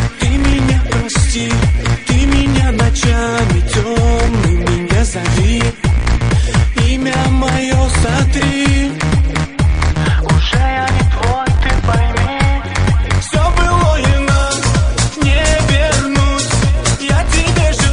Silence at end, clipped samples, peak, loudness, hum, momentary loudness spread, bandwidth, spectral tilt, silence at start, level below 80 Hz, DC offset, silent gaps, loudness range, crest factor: 0 s; under 0.1%; 0 dBFS; -13 LUFS; none; 3 LU; 11 kHz; -5 dB/octave; 0 s; -16 dBFS; under 0.1%; none; 1 LU; 12 dB